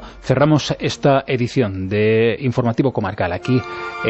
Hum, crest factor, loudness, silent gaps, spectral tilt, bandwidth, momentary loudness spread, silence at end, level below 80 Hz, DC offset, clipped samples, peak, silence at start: none; 16 dB; -18 LUFS; none; -6.5 dB/octave; 8.4 kHz; 6 LU; 0 s; -46 dBFS; under 0.1%; under 0.1%; -2 dBFS; 0 s